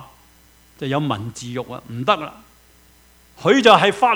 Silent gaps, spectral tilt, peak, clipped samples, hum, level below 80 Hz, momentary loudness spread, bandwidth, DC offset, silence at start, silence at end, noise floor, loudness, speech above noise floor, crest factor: none; -5 dB/octave; 0 dBFS; under 0.1%; none; -56 dBFS; 19 LU; over 20 kHz; under 0.1%; 0 s; 0 s; -52 dBFS; -18 LUFS; 34 dB; 20 dB